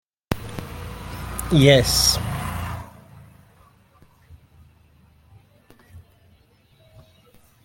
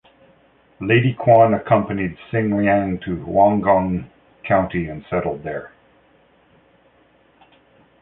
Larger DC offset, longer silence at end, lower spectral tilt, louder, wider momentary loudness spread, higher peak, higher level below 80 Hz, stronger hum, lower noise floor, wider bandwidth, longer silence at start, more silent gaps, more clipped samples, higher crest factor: neither; second, 1.65 s vs 2.35 s; second, -4 dB/octave vs -11.5 dB/octave; about the same, -20 LUFS vs -19 LUFS; first, 21 LU vs 14 LU; about the same, -2 dBFS vs -2 dBFS; first, -40 dBFS vs -46 dBFS; neither; about the same, -57 dBFS vs -56 dBFS; first, 17 kHz vs 4 kHz; second, 0.3 s vs 0.8 s; neither; neither; first, 24 dB vs 18 dB